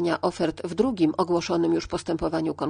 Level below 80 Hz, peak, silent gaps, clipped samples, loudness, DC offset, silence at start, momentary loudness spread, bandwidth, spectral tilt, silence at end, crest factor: -50 dBFS; -8 dBFS; none; under 0.1%; -25 LUFS; under 0.1%; 0 s; 5 LU; 10 kHz; -6 dB/octave; 0 s; 16 dB